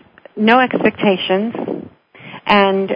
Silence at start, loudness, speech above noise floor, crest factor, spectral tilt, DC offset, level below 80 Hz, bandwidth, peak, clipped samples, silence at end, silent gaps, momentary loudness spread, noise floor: 0.35 s; -15 LUFS; 25 dB; 16 dB; -7.5 dB/octave; under 0.1%; -56 dBFS; 5.2 kHz; 0 dBFS; under 0.1%; 0 s; none; 16 LU; -39 dBFS